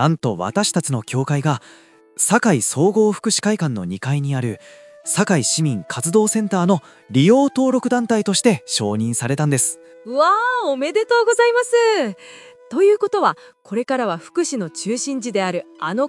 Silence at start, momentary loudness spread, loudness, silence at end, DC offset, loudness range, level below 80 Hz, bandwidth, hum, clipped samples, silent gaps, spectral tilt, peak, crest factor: 0 s; 10 LU; -18 LUFS; 0 s; under 0.1%; 3 LU; -70 dBFS; 12 kHz; none; under 0.1%; none; -4.5 dB/octave; 0 dBFS; 18 dB